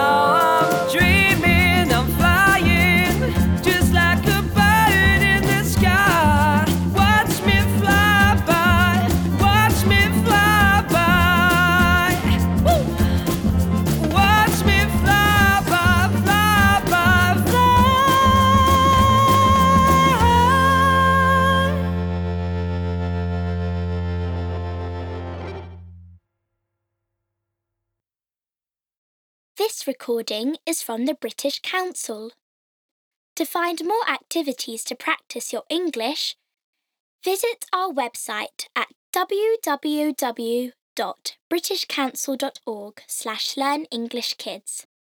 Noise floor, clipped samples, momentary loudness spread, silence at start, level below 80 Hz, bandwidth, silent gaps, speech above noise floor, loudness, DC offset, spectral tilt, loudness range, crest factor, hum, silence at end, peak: under -90 dBFS; under 0.1%; 14 LU; 0 s; -30 dBFS; over 20 kHz; 28.97-29.55 s, 32.41-33.36 s, 36.64-36.73 s, 37.00-37.19 s, 38.95-39.13 s, 40.81-40.96 s, 41.40-41.51 s; over 65 dB; -18 LUFS; under 0.1%; -5 dB/octave; 12 LU; 14 dB; none; 0.3 s; -6 dBFS